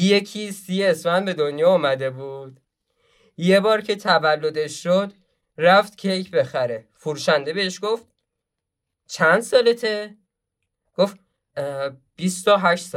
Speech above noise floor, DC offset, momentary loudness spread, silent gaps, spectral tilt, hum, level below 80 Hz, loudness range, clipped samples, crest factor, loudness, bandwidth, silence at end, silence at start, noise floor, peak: 62 dB; under 0.1%; 14 LU; none; -4.5 dB/octave; none; -72 dBFS; 4 LU; under 0.1%; 18 dB; -21 LUFS; 15 kHz; 0 s; 0 s; -82 dBFS; -4 dBFS